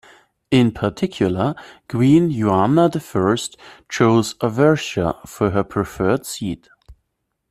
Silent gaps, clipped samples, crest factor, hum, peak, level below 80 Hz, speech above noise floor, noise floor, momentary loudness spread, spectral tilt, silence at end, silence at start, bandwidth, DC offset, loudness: none; under 0.1%; 16 dB; none; -2 dBFS; -48 dBFS; 56 dB; -74 dBFS; 12 LU; -6.5 dB/octave; 0.6 s; 0.5 s; 14.5 kHz; under 0.1%; -19 LUFS